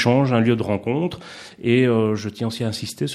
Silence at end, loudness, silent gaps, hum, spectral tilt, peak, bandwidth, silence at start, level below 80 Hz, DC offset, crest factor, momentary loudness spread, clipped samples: 0 s; -21 LUFS; none; none; -6.5 dB/octave; -2 dBFS; 14 kHz; 0 s; -58 dBFS; under 0.1%; 18 dB; 10 LU; under 0.1%